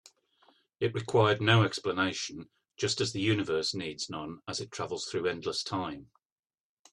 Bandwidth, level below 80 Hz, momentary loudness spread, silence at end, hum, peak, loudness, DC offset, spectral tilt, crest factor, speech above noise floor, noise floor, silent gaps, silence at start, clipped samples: 11 kHz; -66 dBFS; 13 LU; 0.9 s; none; -8 dBFS; -30 LUFS; under 0.1%; -4.5 dB/octave; 22 dB; over 60 dB; under -90 dBFS; none; 0.8 s; under 0.1%